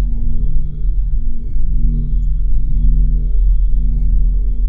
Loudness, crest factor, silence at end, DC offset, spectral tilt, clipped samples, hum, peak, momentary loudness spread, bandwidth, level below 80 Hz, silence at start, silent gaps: -20 LUFS; 10 dB; 0 s; 3%; -12 dB/octave; under 0.1%; none; -2 dBFS; 5 LU; 0.6 kHz; -14 dBFS; 0 s; none